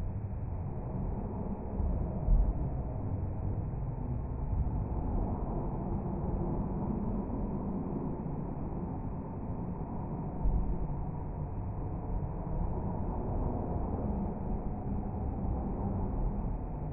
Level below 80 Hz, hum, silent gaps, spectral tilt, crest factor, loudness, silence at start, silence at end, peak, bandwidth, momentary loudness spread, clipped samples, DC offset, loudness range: -36 dBFS; none; none; -10 dB/octave; 16 dB; -37 LUFS; 0 s; 0 s; -18 dBFS; 2.7 kHz; 4 LU; under 0.1%; under 0.1%; 2 LU